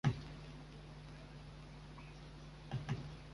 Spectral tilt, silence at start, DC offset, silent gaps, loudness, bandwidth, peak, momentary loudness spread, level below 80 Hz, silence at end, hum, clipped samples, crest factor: -6.5 dB/octave; 0.05 s; under 0.1%; none; -49 LUFS; 11.5 kHz; -22 dBFS; 11 LU; -58 dBFS; 0 s; none; under 0.1%; 24 dB